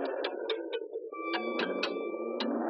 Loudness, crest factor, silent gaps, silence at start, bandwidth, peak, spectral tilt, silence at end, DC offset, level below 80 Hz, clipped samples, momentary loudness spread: -35 LUFS; 16 dB; none; 0 s; 8 kHz; -18 dBFS; -4.5 dB/octave; 0 s; under 0.1%; under -90 dBFS; under 0.1%; 6 LU